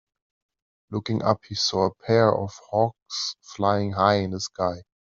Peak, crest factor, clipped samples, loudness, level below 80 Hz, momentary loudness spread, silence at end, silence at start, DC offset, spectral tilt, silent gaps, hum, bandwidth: -4 dBFS; 20 dB; under 0.1%; -24 LUFS; -62 dBFS; 9 LU; 0.2 s; 0.9 s; under 0.1%; -5 dB/octave; 3.02-3.06 s; none; 7.8 kHz